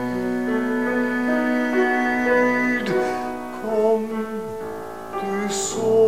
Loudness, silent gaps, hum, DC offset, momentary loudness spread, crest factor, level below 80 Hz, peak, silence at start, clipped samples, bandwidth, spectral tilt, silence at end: -22 LUFS; none; none; 0.6%; 11 LU; 14 dB; -56 dBFS; -8 dBFS; 0 s; under 0.1%; 15.5 kHz; -4.5 dB/octave; 0 s